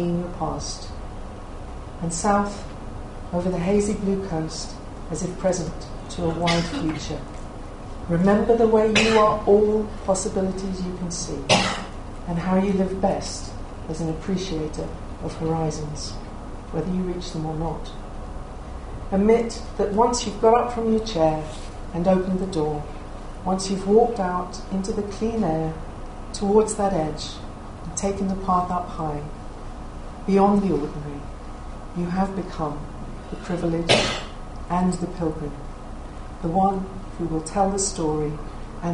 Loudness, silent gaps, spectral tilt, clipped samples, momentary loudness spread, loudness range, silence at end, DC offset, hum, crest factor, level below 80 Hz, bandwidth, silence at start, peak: -24 LUFS; none; -5 dB/octave; under 0.1%; 19 LU; 8 LU; 0 s; under 0.1%; none; 22 dB; -36 dBFS; 11 kHz; 0 s; -2 dBFS